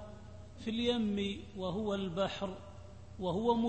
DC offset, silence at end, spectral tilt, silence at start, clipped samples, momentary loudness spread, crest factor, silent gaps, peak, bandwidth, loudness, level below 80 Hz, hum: 0.1%; 0 s; -6.5 dB/octave; 0 s; under 0.1%; 20 LU; 18 dB; none; -18 dBFS; 8.4 kHz; -36 LUFS; -58 dBFS; none